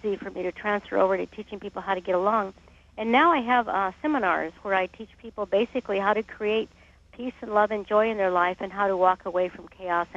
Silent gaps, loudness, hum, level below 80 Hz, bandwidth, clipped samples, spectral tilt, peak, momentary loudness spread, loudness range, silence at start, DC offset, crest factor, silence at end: none; -25 LUFS; none; -58 dBFS; 7.8 kHz; under 0.1%; -6.5 dB/octave; -6 dBFS; 13 LU; 3 LU; 0.05 s; under 0.1%; 20 dB; 0 s